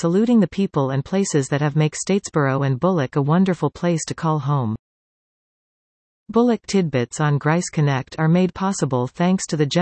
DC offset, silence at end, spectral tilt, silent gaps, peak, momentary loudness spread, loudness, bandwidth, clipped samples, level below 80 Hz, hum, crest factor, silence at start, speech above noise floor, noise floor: under 0.1%; 0 s; -6 dB/octave; 4.79-6.26 s; -6 dBFS; 4 LU; -20 LUFS; 8.8 kHz; under 0.1%; -56 dBFS; none; 14 dB; 0 s; over 71 dB; under -90 dBFS